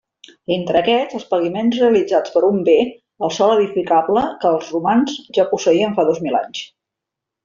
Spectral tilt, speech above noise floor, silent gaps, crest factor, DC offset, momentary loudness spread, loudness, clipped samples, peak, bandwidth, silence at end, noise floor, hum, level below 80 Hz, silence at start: -4 dB/octave; 67 dB; none; 14 dB; under 0.1%; 8 LU; -17 LUFS; under 0.1%; -2 dBFS; 7.4 kHz; 0.8 s; -83 dBFS; none; -58 dBFS; 0.5 s